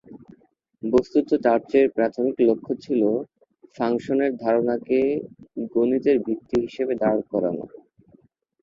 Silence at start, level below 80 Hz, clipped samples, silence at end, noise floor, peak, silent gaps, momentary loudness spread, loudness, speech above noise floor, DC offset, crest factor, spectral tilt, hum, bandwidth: 0.1 s; -60 dBFS; under 0.1%; 0.95 s; -59 dBFS; -4 dBFS; none; 9 LU; -23 LUFS; 37 dB; under 0.1%; 18 dB; -8 dB/octave; none; 7.4 kHz